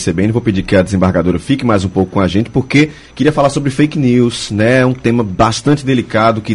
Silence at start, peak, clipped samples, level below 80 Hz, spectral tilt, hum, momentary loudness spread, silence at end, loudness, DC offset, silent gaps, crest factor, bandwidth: 0 s; 0 dBFS; under 0.1%; -36 dBFS; -6.5 dB/octave; none; 3 LU; 0 s; -13 LUFS; under 0.1%; none; 12 dB; 11.5 kHz